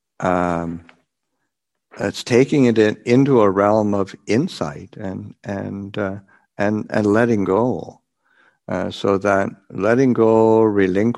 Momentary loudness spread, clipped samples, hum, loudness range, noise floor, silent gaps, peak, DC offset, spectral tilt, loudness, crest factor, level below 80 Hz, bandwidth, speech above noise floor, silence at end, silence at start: 15 LU; under 0.1%; none; 5 LU; -77 dBFS; none; -2 dBFS; under 0.1%; -7 dB/octave; -18 LUFS; 18 dB; -56 dBFS; 12 kHz; 59 dB; 0 s; 0.2 s